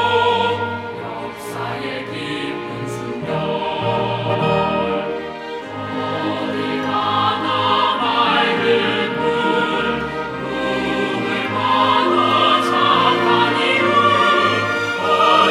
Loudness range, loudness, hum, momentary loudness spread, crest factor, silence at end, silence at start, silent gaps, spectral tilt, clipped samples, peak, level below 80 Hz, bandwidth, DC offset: 8 LU; -18 LUFS; none; 12 LU; 16 dB; 0 s; 0 s; none; -5 dB/octave; under 0.1%; -2 dBFS; -52 dBFS; 15 kHz; under 0.1%